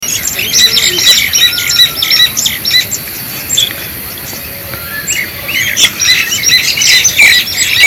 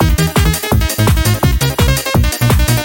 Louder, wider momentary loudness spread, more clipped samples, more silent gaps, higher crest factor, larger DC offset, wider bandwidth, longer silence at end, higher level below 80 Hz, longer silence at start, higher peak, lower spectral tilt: first, -7 LUFS vs -13 LUFS; first, 15 LU vs 2 LU; first, 1% vs under 0.1%; neither; about the same, 10 dB vs 12 dB; neither; about the same, over 20 kHz vs 18.5 kHz; about the same, 0 s vs 0 s; second, -40 dBFS vs -18 dBFS; about the same, 0 s vs 0 s; about the same, 0 dBFS vs 0 dBFS; second, 1 dB/octave vs -4.5 dB/octave